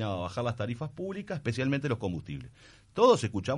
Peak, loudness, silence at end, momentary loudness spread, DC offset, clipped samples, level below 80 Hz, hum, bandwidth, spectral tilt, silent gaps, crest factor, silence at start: -10 dBFS; -30 LUFS; 0 s; 17 LU; under 0.1%; under 0.1%; -58 dBFS; none; 11.5 kHz; -6 dB/octave; none; 20 dB; 0 s